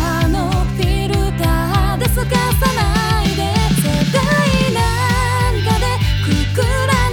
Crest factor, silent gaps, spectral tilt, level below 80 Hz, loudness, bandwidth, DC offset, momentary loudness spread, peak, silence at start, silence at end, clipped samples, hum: 12 dB; none; -5 dB/octave; -22 dBFS; -16 LUFS; 19.5 kHz; under 0.1%; 3 LU; -2 dBFS; 0 s; 0 s; under 0.1%; none